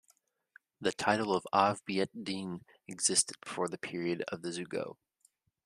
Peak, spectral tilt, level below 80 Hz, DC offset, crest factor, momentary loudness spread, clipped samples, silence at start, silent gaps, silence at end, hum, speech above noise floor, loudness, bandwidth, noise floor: -10 dBFS; -3 dB/octave; -76 dBFS; under 0.1%; 24 dB; 11 LU; under 0.1%; 0.8 s; none; 0.7 s; none; 39 dB; -33 LUFS; 14 kHz; -72 dBFS